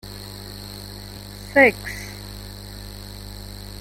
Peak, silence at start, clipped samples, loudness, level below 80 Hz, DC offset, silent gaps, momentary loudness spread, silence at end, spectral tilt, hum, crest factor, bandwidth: -2 dBFS; 0.05 s; under 0.1%; -19 LUFS; -42 dBFS; under 0.1%; none; 21 LU; 0 s; -4.5 dB/octave; 50 Hz at -40 dBFS; 24 dB; 17 kHz